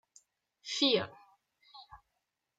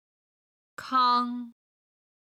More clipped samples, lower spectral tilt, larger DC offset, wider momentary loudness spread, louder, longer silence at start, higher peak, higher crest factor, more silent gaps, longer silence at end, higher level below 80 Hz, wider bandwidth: neither; about the same, -3 dB/octave vs -3 dB/octave; neither; first, 25 LU vs 21 LU; second, -31 LUFS vs -25 LUFS; second, 0.65 s vs 0.8 s; second, -16 dBFS vs -12 dBFS; about the same, 20 dB vs 18 dB; neither; second, 0.65 s vs 0.8 s; first, -76 dBFS vs -82 dBFS; second, 9.2 kHz vs 12.5 kHz